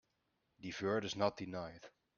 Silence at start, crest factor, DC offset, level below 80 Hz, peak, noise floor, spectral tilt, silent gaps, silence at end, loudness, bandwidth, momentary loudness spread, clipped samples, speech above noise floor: 0.6 s; 22 dB; under 0.1%; -74 dBFS; -20 dBFS; -83 dBFS; -5 dB/octave; none; 0.3 s; -40 LUFS; 7.2 kHz; 14 LU; under 0.1%; 43 dB